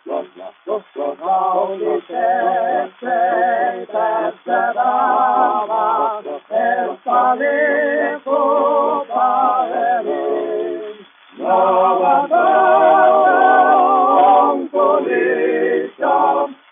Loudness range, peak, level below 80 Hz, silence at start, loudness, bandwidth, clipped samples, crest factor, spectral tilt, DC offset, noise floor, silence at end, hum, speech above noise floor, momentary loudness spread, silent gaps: 6 LU; -2 dBFS; -82 dBFS; 0.05 s; -16 LUFS; 3.7 kHz; under 0.1%; 12 dB; -9 dB/octave; under 0.1%; -38 dBFS; 0.2 s; none; 21 dB; 11 LU; none